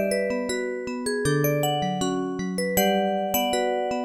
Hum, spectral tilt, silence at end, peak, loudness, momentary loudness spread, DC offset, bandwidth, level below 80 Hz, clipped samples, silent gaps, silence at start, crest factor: none; -4.5 dB/octave; 0 s; -8 dBFS; -25 LUFS; 6 LU; under 0.1%; 19.5 kHz; -54 dBFS; under 0.1%; none; 0 s; 16 dB